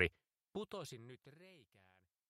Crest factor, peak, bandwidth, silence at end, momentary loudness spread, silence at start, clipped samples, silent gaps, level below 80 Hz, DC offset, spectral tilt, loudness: 30 dB; -16 dBFS; 15 kHz; 0.65 s; 19 LU; 0 s; under 0.1%; none; -68 dBFS; under 0.1%; -4.5 dB/octave; -46 LUFS